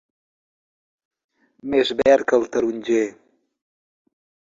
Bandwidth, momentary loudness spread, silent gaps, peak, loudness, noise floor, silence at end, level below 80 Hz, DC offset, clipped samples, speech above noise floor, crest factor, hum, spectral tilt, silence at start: 7.8 kHz; 9 LU; none; -4 dBFS; -20 LUFS; under -90 dBFS; 1.45 s; -60 dBFS; under 0.1%; under 0.1%; over 71 dB; 20 dB; none; -4 dB/octave; 1.65 s